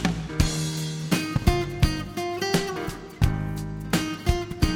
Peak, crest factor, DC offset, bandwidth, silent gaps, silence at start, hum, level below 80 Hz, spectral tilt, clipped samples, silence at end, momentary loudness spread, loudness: -4 dBFS; 20 dB; under 0.1%; 18.5 kHz; none; 0 s; none; -32 dBFS; -5 dB/octave; under 0.1%; 0 s; 6 LU; -26 LUFS